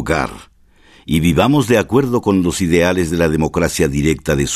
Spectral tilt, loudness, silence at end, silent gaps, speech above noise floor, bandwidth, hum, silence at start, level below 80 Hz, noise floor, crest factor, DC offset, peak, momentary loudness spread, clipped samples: -5.5 dB/octave; -15 LUFS; 0 s; none; 33 dB; 14 kHz; none; 0 s; -32 dBFS; -48 dBFS; 14 dB; under 0.1%; 0 dBFS; 5 LU; under 0.1%